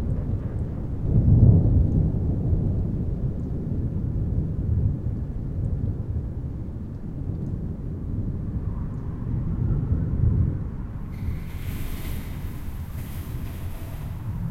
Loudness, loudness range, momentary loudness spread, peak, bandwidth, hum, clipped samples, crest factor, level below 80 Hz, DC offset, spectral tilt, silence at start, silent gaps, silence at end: -27 LUFS; 9 LU; 13 LU; -2 dBFS; 15.5 kHz; none; under 0.1%; 22 dB; -30 dBFS; under 0.1%; -9.5 dB/octave; 0 s; none; 0 s